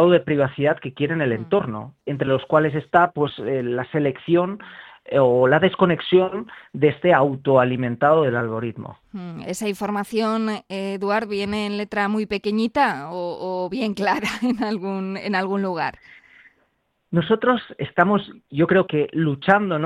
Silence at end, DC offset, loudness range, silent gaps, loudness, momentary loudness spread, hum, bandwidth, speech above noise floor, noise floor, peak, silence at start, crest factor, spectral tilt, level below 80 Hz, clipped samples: 0 s; under 0.1%; 6 LU; none; -21 LUFS; 11 LU; none; 14 kHz; 47 dB; -68 dBFS; 0 dBFS; 0 s; 20 dB; -7 dB/octave; -58 dBFS; under 0.1%